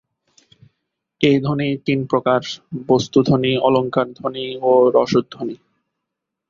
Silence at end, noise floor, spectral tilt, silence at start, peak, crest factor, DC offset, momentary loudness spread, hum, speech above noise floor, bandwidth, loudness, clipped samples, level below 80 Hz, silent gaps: 0.95 s; -81 dBFS; -6.5 dB/octave; 1.2 s; -2 dBFS; 18 dB; under 0.1%; 14 LU; none; 63 dB; 7.4 kHz; -18 LUFS; under 0.1%; -56 dBFS; none